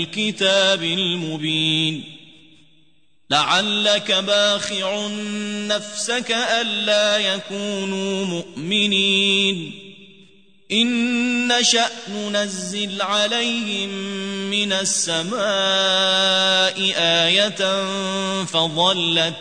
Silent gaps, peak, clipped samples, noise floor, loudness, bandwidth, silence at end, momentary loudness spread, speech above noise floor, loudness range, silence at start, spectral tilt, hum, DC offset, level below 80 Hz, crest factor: none; -4 dBFS; under 0.1%; -62 dBFS; -18 LUFS; 9.6 kHz; 0 s; 9 LU; 42 dB; 4 LU; 0 s; -2.5 dB/octave; none; 0.2%; -68 dBFS; 16 dB